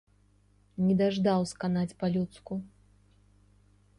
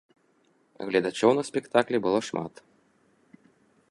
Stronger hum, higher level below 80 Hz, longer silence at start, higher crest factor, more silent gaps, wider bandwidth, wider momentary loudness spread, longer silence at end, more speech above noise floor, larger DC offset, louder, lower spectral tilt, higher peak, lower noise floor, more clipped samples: first, 50 Hz at -55 dBFS vs none; first, -62 dBFS vs -70 dBFS; about the same, 0.8 s vs 0.8 s; second, 18 dB vs 24 dB; neither; about the same, 11.5 kHz vs 11.5 kHz; about the same, 13 LU vs 12 LU; second, 1.3 s vs 1.45 s; second, 36 dB vs 41 dB; neither; second, -30 LUFS vs -26 LUFS; first, -7 dB/octave vs -5 dB/octave; second, -14 dBFS vs -6 dBFS; about the same, -64 dBFS vs -66 dBFS; neither